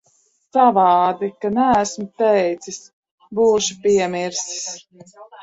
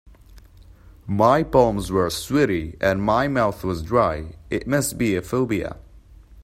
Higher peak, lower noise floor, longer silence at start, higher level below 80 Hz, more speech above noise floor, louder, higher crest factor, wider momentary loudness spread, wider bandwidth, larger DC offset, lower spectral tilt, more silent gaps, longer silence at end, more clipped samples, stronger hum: about the same, -2 dBFS vs -2 dBFS; first, -61 dBFS vs -47 dBFS; first, 0.55 s vs 0.05 s; second, -58 dBFS vs -42 dBFS; first, 43 dB vs 26 dB; first, -18 LUFS vs -21 LUFS; about the same, 18 dB vs 20 dB; first, 15 LU vs 11 LU; second, 8.2 kHz vs 16 kHz; neither; second, -3.5 dB/octave vs -5.5 dB/octave; first, 2.93-3.03 s, 3.11-3.18 s vs none; about the same, 0 s vs 0 s; neither; neither